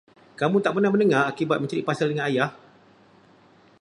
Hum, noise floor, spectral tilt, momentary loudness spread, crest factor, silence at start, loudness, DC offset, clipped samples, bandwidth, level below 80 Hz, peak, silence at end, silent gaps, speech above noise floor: none; -55 dBFS; -6.5 dB/octave; 6 LU; 18 dB; 0.4 s; -23 LUFS; under 0.1%; under 0.1%; 10.5 kHz; -70 dBFS; -6 dBFS; 1.25 s; none; 33 dB